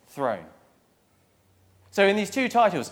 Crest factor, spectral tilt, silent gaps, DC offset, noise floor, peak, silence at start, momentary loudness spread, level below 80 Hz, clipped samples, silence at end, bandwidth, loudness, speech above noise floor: 20 dB; -4.5 dB/octave; none; under 0.1%; -64 dBFS; -6 dBFS; 0.15 s; 10 LU; -74 dBFS; under 0.1%; 0 s; 17.5 kHz; -24 LUFS; 41 dB